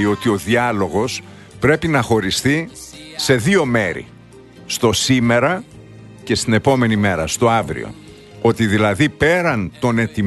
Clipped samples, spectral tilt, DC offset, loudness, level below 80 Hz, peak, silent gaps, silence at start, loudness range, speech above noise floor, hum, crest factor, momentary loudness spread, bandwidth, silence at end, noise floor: under 0.1%; -5 dB/octave; under 0.1%; -17 LUFS; -44 dBFS; 0 dBFS; none; 0 s; 2 LU; 25 dB; none; 16 dB; 11 LU; 12.5 kHz; 0 s; -41 dBFS